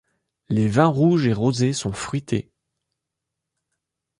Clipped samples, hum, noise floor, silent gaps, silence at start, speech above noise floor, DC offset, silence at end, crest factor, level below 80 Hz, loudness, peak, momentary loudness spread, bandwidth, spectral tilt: under 0.1%; none; -83 dBFS; none; 0.5 s; 63 dB; under 0.1%; 1.8 s; 20 dB; -52 dBFS; -21 LUFS; -4 dBFS; 10 LU; 11.5 kHz; -6.5 dB/octave